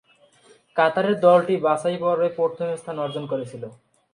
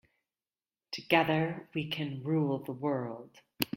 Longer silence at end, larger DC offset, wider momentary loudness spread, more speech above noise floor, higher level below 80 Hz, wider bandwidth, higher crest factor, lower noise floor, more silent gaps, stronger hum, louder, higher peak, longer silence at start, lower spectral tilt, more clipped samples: first, 0.4 s vs 0 s; neither; about the same, 13 LU vs 15 LU; second, 34 dB vs over 58 dB; about the same, -72 dBFS vs -72 dBFS; second, 10.5 kHz vs 16.5 kHz; second, 18 dB vs 26 dB; second, -56 dBFS vs under -90 dBFS; neither; neither; first, -22 LUFS vs -32 LUFS; first, -4 dBFS vs -8 dBFS; second, 0.75 s vs 0.9 s; about the same, -6 dB/octave vs -6 dB/octave; neither